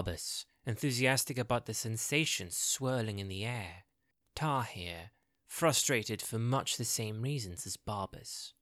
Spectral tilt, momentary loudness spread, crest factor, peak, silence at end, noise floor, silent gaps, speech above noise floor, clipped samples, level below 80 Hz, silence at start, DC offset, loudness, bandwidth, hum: -3.5 dB/octave; 12 LU; 20 dB; -16 dBFS; 0.1 s; -80 dBFS; none; 45 dB; under 0.1%; -62 dBFS; 0 s; under 0.1%; -34 LUFS; 16.5 kHz; none